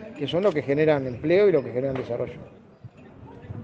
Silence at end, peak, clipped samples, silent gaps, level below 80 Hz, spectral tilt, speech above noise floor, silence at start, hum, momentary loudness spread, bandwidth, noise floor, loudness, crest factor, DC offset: 0 s; -6 dBFS; under 0.1%; none; -60 dBFS; -8 dB/octave; 23 dB; 0 s; none; 18 LU; 7.4 kHz; -47 dBFS; -24 LUFS; 18 dB; under 0.1%